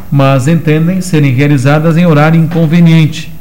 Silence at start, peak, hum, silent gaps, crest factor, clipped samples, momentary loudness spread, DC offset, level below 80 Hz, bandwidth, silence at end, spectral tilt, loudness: 0 s; 0 dBFS; none; none; 8 dB; under 0.1%; 4 LU; 8%; -38 dBFS; 15.5 kHz; 0 s; -7.5 dB/octave; -8 LUFS